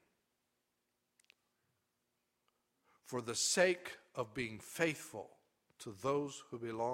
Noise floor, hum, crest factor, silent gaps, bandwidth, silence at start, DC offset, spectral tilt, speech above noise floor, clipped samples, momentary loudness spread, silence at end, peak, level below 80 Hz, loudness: -85 dBFS; 60 Hz at -70 dBFS; 26 dB; none; 16 kHz; 3.05 s; under 0.1%; -3 dB/octave; 47 dB; under 0.1%; 18 LU; 0 s; -16 dBFS; -78 dBFS; -38 LUFS